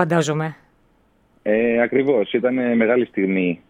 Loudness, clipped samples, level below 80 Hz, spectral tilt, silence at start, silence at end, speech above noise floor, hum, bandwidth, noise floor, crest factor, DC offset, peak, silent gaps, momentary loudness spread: -19 LUFS; under 0.1%; -60 dBFS; -6.5 dB/octave; 0 s; 0.15 s; 40 dB; none; 11.5 kHz; -59 dBFS; 18 dB; under 0.1%; -2 dBFS; none; 6 LU